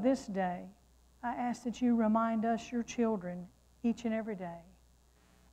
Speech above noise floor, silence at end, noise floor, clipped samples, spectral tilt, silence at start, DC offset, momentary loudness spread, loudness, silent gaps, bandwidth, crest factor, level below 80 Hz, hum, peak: 32 dB; 0.9 s; -65 dBFS; under 0.1%; -6.5 dB/octave; 0 s; under 0.1%; 15 LU; -35 LUFS; none; 9 kHz; 16 dB; -64 dBFS; none; -18 dBFS